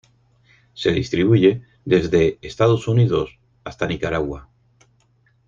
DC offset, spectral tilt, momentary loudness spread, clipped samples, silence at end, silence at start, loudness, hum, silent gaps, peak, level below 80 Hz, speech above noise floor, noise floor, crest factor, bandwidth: under 0.1%; -7.5 dB/octave; 15 LU; under 0.1%; 1.05 s; 0.75 s; -19 LUFS; none; none; -2 dBFS; -46 dBFS; 42 dB; -60 dBFS; 18 dB; 7.4 kHz